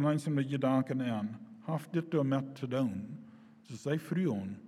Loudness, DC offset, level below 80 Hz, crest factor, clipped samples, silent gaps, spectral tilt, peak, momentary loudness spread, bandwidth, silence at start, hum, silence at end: -34 LUFS; under 0.1%; -80 dBFS; 16 dB; under 0.1%; none; -7.5 dB/octave; -18 dBFS; 12 LU; 14 kHz; 0 s; none; 0 s